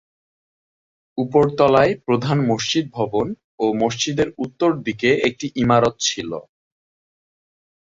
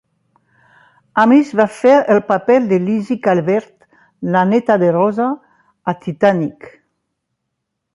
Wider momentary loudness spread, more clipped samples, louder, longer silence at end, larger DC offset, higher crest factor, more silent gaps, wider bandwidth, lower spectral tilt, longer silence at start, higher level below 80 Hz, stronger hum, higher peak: about the same, 10 LU vs 11 LU; neither; second, -19 LUFS vs -15 LUFS; first, 1.45 s vs 1.25 s; neither; about the same, 18 dB vs 14 dB; first, 3.44-3.58 s vs none; second, 7.8 kHz vs 11.5 kHz; second, -5 dB/octave vs -7.5 dB/octave; about the same, 1.15 s vs 1.15 s; first, -52 dBFS vs -62 dBFS; neither; about the same, -2 dBFS vs -2 dBFS